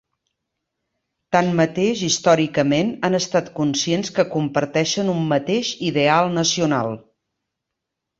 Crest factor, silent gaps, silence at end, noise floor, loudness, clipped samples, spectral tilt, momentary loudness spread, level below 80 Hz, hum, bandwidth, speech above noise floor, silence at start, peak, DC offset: 18 dB; none; 1.2 s; -81 dBFS; -19 LUFS; under 0.1%; -4.5 dB/octave; 5 LU; -60 dBFS; none; 7.8 kHz; 62 dB; 1.3 s; -2 dBFS; under 0.1%